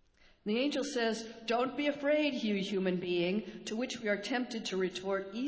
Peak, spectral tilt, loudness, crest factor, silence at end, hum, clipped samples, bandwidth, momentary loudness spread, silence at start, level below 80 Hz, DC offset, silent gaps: -20 dBFS; -4.5 dB/octave; -34 LUFS; 14 dB; 0 s; none; under 0.1%; 8 kHz; 7 LU; 0.45 s; -70 dBFS; under 0.1%; none